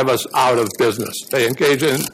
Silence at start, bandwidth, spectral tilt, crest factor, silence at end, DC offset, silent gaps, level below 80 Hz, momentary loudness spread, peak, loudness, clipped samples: 0 s; 16 kHz; -4 dB/octave; 12 dB; 0 s; under 0.1%; none; -58 dBFS; 4 LU; -6 dBFS; -17 LUFS; under 0.1%